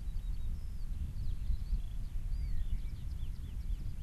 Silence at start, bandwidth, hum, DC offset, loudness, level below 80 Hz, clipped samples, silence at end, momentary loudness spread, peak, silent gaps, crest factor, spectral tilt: 0 s; 12.5 kHz; none; under 0.1%; -43 LUFS; -36 dBFS; under 0.1%; 0 s; 4 LU; -24 dBFS; none; 12 dB; -7 dB/octave